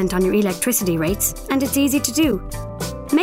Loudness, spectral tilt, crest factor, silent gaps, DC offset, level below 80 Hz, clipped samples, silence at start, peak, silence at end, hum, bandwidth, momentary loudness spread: -19 LUFS; -4 dB/octave; 14 dB; none; under 0.1%; -36 dBFS; under 0.1%; 0 s; -4 dBFS; 0 s; none; 16 kHz; 10 LU